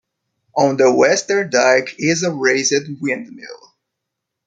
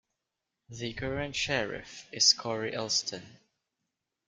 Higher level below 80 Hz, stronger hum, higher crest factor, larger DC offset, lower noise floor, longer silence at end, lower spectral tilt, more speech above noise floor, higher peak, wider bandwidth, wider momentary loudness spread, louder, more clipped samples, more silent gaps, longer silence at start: second, -64 dBFS vs -58 dBFS; neither; second, 18 dB vs 26 dB; neither; second, -79 dBFS vs -86 dBFS; about the same, 0.9 s vs 0.95 s; first, -3.5 dB/octave vs -1.5 dB/octave; first, 63 dB vs 55 dB; first, 0 dBFS vs -8 dBFS; second, 9.4 kHz vs 12 kHz; second, 12 LU vs 19 LU; first, -16 LUFS vs -29 LUFS; neither; neither; second, 0.55 s vs 0.7 s